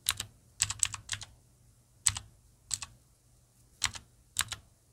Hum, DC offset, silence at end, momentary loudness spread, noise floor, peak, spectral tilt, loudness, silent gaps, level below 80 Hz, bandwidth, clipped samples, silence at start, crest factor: none; under 0.1%; 0.3 s; 14 LU; -65 dBFS; -4 dBFS; 0.5 dB/octave; -34 LUFS; none; -58 dBFS; 17 kHz; under 0.1%; 0.05 s; 34 dB